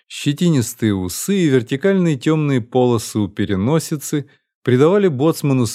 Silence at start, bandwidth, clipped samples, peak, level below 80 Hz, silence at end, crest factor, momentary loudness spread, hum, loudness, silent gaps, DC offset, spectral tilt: 0.1 s; 16 kHz; under 0.1%; -2 dBFS; -56 dBFS; 0 s; 14 dB; 7 LU; none; -17 LUFS; 4.55-4.62 s; under 0.1%; -6 dB/octave